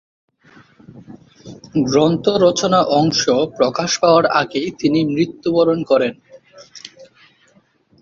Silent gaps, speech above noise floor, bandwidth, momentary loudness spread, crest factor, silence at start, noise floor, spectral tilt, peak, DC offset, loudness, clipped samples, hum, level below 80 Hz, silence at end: none; 40 dB; 7.6 kHz; 10 LU; 16 dB; 0.95 s; -56 dBFS; -5 dB/octave; -2 dBFS; under 0.1%; -16 LUFS; under 0.1%; none; -56 dBFS; 1 s